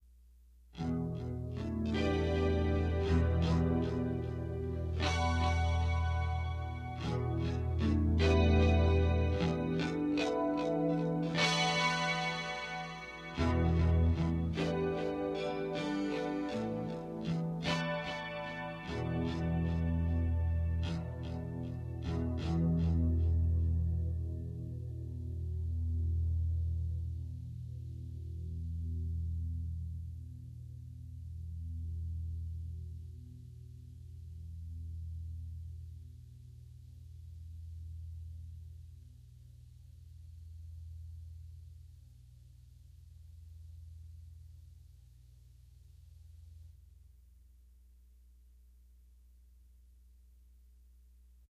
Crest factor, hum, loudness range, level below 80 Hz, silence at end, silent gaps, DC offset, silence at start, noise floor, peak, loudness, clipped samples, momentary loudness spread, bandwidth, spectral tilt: 20 dB; none; 21 LU; -42 dBFS; 4.45 s; none; under 0.1%; 0.7 s; -60 dBFS; -16 dBFS; -35 LUFS; under 0.1%; 22 LU; 9.2 kHz; -6.5 dB/octave